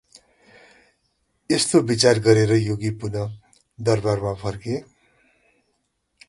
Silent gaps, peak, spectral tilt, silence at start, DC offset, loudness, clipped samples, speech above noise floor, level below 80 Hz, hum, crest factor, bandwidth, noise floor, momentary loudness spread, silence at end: none; -2 dBFS; -5 dB/octave; 1.5 s; under 0.1%; -21 LUFS; under 0.1%; 52 dB; -52 dBFS; none; 20 dB; 11.5 kHz; -72 dBFS; 13 LU; 1.45 s